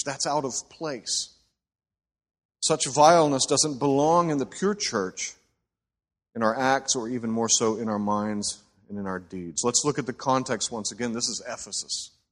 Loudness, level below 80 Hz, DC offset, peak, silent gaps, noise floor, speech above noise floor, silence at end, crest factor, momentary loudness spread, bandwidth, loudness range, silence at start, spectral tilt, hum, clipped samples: -25 LUFS; -64 dBFS; under 0.1%; -4 dBFS; 2.45-2.49 s; -81 dBFS; 56 dB; 0.25 s; 22 dB; 12 LU; 13 kHz; 5 LU; 0 s; -3 dB/octave; none; under 0.1%